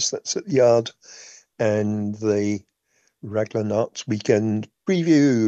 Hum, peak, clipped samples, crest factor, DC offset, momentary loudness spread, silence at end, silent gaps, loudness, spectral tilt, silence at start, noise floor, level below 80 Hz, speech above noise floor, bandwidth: none; -4 dBFS; under 0.1%; 16 dB; under 0.1%; 15 LU; 0 s; none; -22 LUFS; -5.5 dB/octave; 0 s; -67 dBFS; -68 dBFS; 46 dB; 8.4 kHz